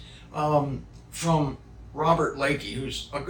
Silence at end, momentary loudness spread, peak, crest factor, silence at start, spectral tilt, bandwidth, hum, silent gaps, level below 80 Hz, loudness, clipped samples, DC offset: 0 s; 15 LU; -8 dBFS; 20 dB; 0 s; -5.5 dB/octave; 19.5 kHz; none; none; -46 dBFS; -26 LUFS; under 0.1%; under 0.1%